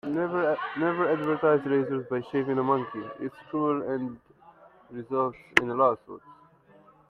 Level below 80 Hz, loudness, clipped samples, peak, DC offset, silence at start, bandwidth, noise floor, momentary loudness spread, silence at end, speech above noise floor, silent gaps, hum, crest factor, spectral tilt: -68 dBFS; -27 LUFS; under 0.1%; 0 dBFS; under 0.1%; 0.05 s; 11.5 kHz; -57 dBFS; 13 LU; 0.75 s; 30 dB; none; none; 28 dB; -6.5 dB/octave